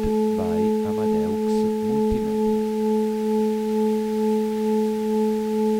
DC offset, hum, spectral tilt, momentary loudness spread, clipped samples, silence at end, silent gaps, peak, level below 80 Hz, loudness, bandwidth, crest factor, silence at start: under 0.1%; none; -7 dB/octave; 1 LU; under 0.1%; 0 s; none; -10 dBFS; -44 dBFS; -22 LUFS; 16 kHz; 12 dB; 0 s